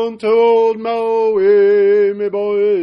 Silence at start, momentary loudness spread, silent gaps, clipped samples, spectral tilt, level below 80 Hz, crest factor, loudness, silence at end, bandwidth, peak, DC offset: 0 s; 6 LU; none; under 0.1%; -7 dB/octave; -64 dBFS; 10 dB; -13 LUFS; 0 s; 5.6 kHz; -4 dBFS; under 0.1%